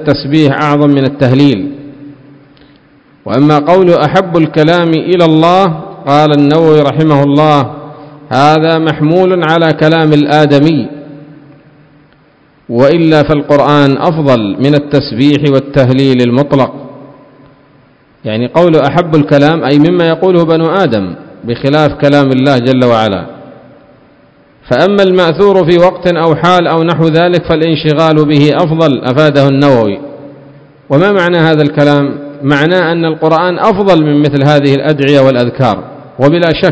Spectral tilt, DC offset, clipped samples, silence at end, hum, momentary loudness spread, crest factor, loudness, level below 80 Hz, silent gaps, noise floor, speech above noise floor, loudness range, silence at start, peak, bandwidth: -7.5 dB/octave; under 0.1%; 3%; 0 s; none; 8 LU; 8 dB; -8 LUFS; -42 dBFS; none; -45 dBFS; 38 dB; 3 LU; 0 s; 0 dBFS; 8 kHz